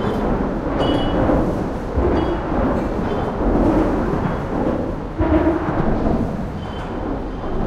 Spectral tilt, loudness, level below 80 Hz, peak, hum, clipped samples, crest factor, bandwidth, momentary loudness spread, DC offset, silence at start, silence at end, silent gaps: -8.5 dB/octave; -20 LUFS; -26 dBFS; -4 dBFS; none; under 0.1%; 16 dB; 11 kHz; 9 LU; under 0.1%; 0 s; 0 s; none